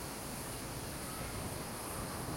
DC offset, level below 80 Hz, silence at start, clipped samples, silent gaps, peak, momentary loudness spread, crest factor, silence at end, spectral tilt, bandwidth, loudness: under 0.1%; -54 dBFS; 0 s; under 0.1%; none; -28 dBFS; 1 LU; 14 dB; 0 s; -3.5 dB/octave; 16.5 kHz; -41 LUFS